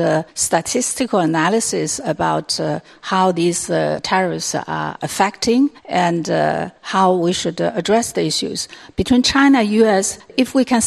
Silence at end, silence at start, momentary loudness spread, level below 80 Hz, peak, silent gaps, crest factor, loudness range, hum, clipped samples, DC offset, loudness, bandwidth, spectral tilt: 0 s; 0 s; 8 LU; -48 dBFS; 0 dBFS; none; 18 dB; 3 LU; none; under 0.1%; under 0.1%; -17 LUFS; 13.5 kHz; -4 dB/octave